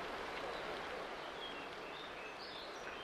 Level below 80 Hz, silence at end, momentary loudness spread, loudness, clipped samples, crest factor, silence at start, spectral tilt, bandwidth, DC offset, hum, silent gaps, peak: -68 dBFS; 0 s; 3 LU; -46 LUFS; under 0.1%; 14 dB; 0 s; -3 dB/octave; 15 kHz; under 0.1%; none; none; -32 dBFS